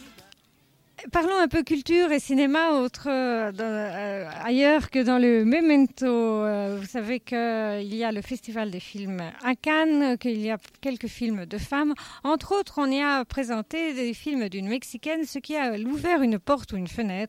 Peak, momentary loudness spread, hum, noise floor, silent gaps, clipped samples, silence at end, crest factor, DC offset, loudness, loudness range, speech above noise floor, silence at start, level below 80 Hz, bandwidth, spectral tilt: -10 dBFS; 11 LU; none; -62 dBFS; none; under 0.1%; 0 s; 16 dB; under 0.1%; -25 LUFS; 5 LU; 37 dB; 0 s; -52 dBFS; 15.5 kHz; -5.5 dB/octave